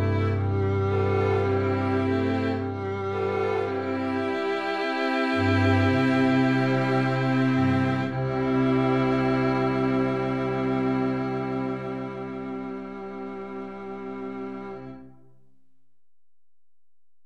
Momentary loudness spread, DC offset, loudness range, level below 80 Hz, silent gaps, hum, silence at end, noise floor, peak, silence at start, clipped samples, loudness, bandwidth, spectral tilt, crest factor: 14 LU; under 0.1%; 14 LU; -56 dBFS; none; none; 0 s; under -90 dBFS; -8 dBFS; 0 s; under 0.1%; -25 LUFS; 8.8 kHz; -8 dB/octave; 16 dB